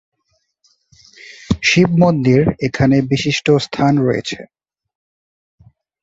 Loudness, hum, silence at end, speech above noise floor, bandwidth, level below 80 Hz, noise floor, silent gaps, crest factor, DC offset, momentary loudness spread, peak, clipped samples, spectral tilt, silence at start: -15 LUFS; none; 1.6 s; 53 dB; 8 kHz; -42 dBFS; -67 dBFS; none; 16 dB; under 0.1%; 10 LU; -2 dBFS; under 0.1%; -6 dB/octave; 1.25 s